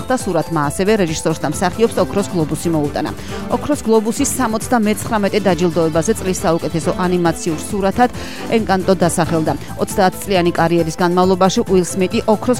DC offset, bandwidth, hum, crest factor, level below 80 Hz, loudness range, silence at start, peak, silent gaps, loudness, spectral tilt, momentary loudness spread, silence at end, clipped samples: 2%; 16.5 kHz; none; 16 dB; -38 dBFS; 2 LU; 0 s; 0 dBFS; none; -16 LUFS; -5 dB/octave; 5 LU; 0 s; under 0.1%